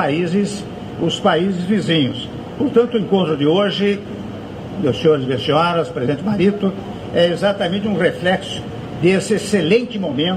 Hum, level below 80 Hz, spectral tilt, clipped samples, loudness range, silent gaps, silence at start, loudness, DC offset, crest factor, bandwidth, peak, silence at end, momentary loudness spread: none; -48 dBFS; -6 dB/octave; under 0.1%; 1 LU; none; 0 s; -18 LUFS; under 0.1%; 16 dB; 13 kHz; -2 dBFS; 0 s; 12 LU